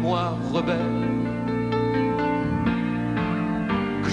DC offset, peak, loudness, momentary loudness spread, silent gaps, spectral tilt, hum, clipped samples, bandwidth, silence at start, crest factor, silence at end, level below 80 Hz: under 0.1%; -10 dBFS; -25 LUFS; 2 LU; none; -7.5 dB/octave; none; under 0.1%; 10 kHz; 0 s; 14 dB; 0 s; -44 dBFS